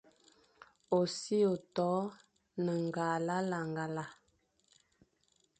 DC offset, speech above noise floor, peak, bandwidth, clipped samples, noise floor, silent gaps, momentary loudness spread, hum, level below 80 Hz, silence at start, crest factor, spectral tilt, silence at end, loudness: under 0.1%; 41 dB; -18 dBFS; 9 kHz; under 0.1%; -75 dBFS; none; 10 LU; none; -78 dBFS; 0.9 s; 20 dB; -6 dB/octave; 1.45 s; -35 LUFS